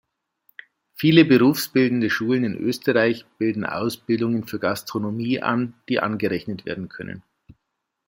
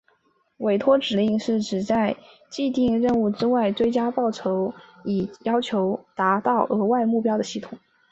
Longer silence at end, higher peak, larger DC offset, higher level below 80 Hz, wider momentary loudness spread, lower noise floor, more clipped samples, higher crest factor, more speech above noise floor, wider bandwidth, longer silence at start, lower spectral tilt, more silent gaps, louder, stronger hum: first, 0.9 s vs 0.35 s; about the same, -2 dBFS vs -4 dBFS; neither; second, -64 dBFS vs -58 dBFS; first, 14 LU vs 8 LU; first, -79 dBFS vs -66 dBFS; neither; about the same, 20 dB vs 18 dB; first, 58 dB vs 43 dB; first, 16.5 kHz vs 8 kHz; first, 1 s vs 0.6 s; about the same, -6 dB/octave vs -6 dB/octave; neither; about the same, -22 LUFS vs -23 LUFS; neither